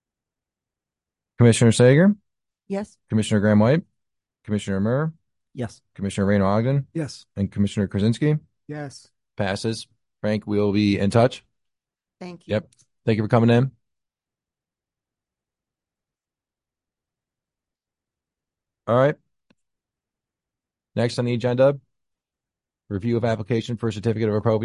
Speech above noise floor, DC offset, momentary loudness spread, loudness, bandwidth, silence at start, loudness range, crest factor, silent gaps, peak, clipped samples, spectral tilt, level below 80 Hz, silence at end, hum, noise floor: over 69 dB; under 0.1%; 16 LU; -22 LUFS; 11.5 kHz; 1.4 s; 8 LU; 20 dB; none; -4 dBFS; under 0.1%; -7 dB/octave; -50 dBFS; 0 s; none; under -90 dBFS